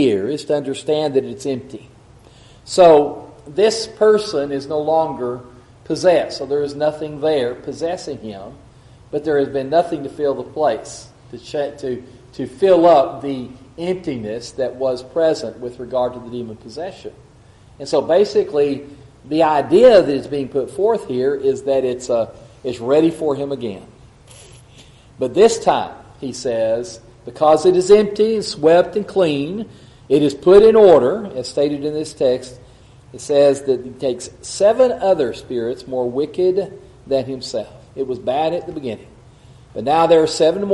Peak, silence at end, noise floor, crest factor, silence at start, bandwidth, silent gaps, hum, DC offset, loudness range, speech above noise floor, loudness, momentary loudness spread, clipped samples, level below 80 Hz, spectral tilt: 0 dBFS; 0 s; -46 dBFS; 18 dB; 0 s; 11.5 kHz; none; none; under 0.1%; 8 LU; 29 dB; -17 LUFS; 17 LU; under 0.1%; -50 dBFS; -5.5 dB/octave